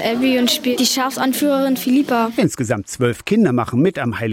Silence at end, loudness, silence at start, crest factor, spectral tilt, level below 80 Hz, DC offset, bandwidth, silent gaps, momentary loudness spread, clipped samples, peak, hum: 0 s; -17 LUFS; 0 s; 12 dB; -4.5 dB/octave; -54 dBFS; under 0.1%; 16.5 kHz; none; 5 LU; under 0.1%; -4 dBFS; none